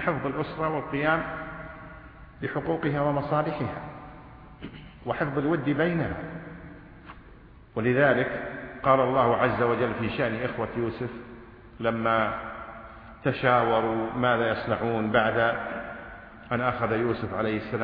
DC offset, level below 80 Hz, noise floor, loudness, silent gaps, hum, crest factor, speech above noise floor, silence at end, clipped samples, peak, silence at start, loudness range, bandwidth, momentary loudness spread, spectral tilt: under 0.1%; -52 dBFS; -50 dBFS; -27 LUFS; none; none; 20 dB; 24 dB; 0 s; under 0.1%; -8 dBFS; 0 s; 6 LU; 5.2 kHz; 21 LU; -10 dB/octave